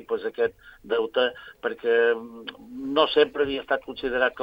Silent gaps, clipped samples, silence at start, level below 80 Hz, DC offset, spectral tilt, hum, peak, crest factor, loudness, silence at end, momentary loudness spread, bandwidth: none; under 0.1%; 0 s; -58 dBFS; under 0.1%; -5.5 dB/octave; none; -6 dBFS; 20 dB; -25 LUFS; 0 s; 12 LU; 5.2 kHz